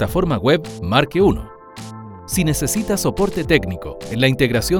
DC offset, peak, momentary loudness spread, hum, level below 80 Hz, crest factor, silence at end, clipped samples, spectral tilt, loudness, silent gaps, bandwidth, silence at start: under 0.1%; 0 dBFS; 18 LU; none; -34 dBFS; 18 dB; 0 s; under 0.1%; -5 dB/octave; -18 LUFS; none; over 20 kHz; 0 s